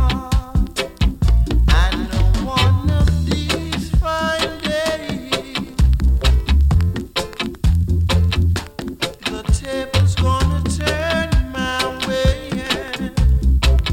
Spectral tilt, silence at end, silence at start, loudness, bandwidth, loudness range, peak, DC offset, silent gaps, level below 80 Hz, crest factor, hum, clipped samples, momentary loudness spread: -5.5 dB/octave; 0 s; 0 s; -19 LUFS; 16 kHz; 2 LU; -2 dBFS; under 0.1%; none; -20 dBFS; 16 dB; none; under 0.1%; 7 LU